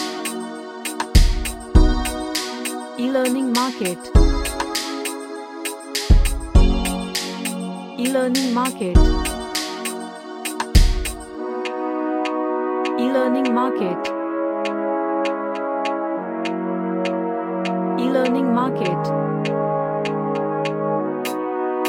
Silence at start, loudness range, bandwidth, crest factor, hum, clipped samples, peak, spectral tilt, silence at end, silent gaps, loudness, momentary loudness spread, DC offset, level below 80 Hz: 0 s; 2 LU; 17 kHz; 18 dB; none; under 0.1%; -2 dBFS; -5 dB/octave; 0 s; none; -22 LUFS; 9 LU; under 0.1%; -24 dBFS